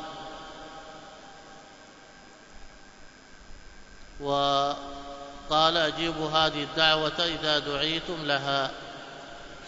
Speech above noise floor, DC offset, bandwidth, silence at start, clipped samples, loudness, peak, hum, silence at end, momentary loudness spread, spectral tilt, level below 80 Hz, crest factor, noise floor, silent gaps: 24 dB; under 0.1%; 8 kHz; 0 s; under 0.1%; -26 LUFS; -6 dBFS; none; 0 s; 22 LU; -3.5 dB/octave; -52 dBFS; 24 dB; -50 dBFS; none